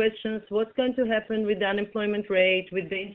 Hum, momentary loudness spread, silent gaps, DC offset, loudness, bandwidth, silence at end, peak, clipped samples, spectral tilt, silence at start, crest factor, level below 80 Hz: none; 7 LU; none; under 0.1%; -26 LUFS; 4.2 kHz; 0 s; -10 dBFS; under 0.1%; -8 dB/octave; 0 s; 16 dB; -62 dBFS